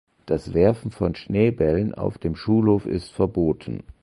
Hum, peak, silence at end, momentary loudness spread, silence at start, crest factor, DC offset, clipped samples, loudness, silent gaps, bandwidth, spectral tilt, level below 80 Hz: none; -4 dBFS; 0.2 s; 8 LU; 0.25 s; 18 dB; under 0.1%; under 0.1%; -23 LUFS; none; 11.5 kHz; -9 dB/octave; -42 dBFS